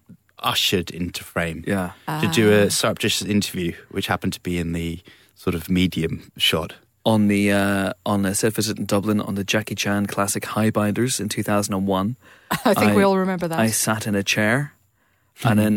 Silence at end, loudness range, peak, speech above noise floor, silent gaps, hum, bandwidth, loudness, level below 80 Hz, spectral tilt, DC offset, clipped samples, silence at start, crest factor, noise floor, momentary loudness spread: 0 s; 3 LU; -6 dBFS; 43 dB; none; none; 17.5 kHz; -21 LUFS; -50 dBFS; -4.5 dB/octave; under 0.1%; under 0.1%; 0.1 s; 16 dB; -64 dBFS; 10 LU